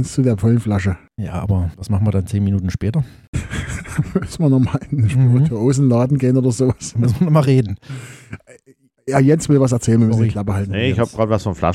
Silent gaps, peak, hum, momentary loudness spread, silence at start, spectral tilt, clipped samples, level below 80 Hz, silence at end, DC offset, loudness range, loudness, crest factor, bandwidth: 3.28-3.33 s; -2 dBFS; none; 12 LU; 0 s; -7.5 dB/octave; under 0.1%; -38 dBFS; 0 s; under 0.1%; 5 LU; -17 LUFS; 16 dB; 12.5 kHz